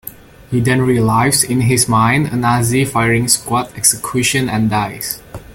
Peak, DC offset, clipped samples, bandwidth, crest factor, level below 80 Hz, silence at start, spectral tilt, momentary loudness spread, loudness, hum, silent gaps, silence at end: 0 dBFS; under 0.1%; under 0.1%; 17 kHz; 14 dB; -42 dBFS; 0.05 s; -4 dB/octave; 9 LU; -14 LUFS; none; none; 0 s